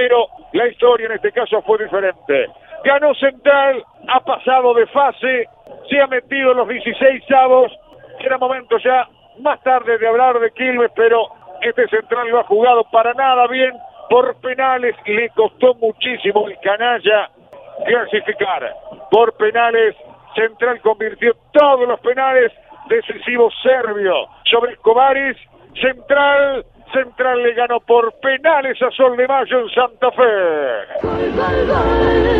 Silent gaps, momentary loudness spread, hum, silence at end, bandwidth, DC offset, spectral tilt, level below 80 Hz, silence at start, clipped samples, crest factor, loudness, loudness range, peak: none; 7 LU; none; 0 s; 4.8 kHz; under 0.1%; -7 dB/octave; -40 dBFS; 0 s; under 0.1%; 16 dB; -15 LUFS; 2 LU; 0 dBFS